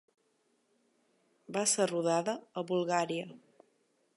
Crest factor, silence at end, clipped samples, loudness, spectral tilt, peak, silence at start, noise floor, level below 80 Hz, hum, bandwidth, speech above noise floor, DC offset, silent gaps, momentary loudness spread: 20 dB; 0.8 s; under 0.1%; -32 LUFS; -3.5 dB/octave; -16 dBFS; 1.5 s; -75 dBFS; -88 dBFS; none; 11.5 kHz; 43 dB; under 0.1%; none; 10 LU